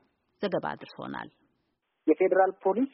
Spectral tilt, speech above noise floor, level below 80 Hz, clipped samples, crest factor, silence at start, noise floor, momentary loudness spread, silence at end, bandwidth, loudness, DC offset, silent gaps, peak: -4.5 dB/octave; 50 dB; -74 dBFS; under 0.1%; 20 dB; 0.4 s; -78 dBFS; 16 LU; 0.05 s; 5.8 kHz; -27 LUFS; under 0.1%; none; -10 dBFS